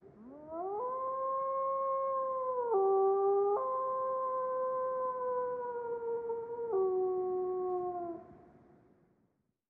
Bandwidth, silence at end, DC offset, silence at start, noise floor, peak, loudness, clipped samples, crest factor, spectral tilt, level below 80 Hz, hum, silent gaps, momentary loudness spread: 2.3 kHz; 1.3 s; under 0.1%; 0.05 s; -77 dBFS; -20 dBFS; -34 LUFS; under 0.1%; 14 dB; -8 dB/octave; -76 dBFS; none; none; 10 LU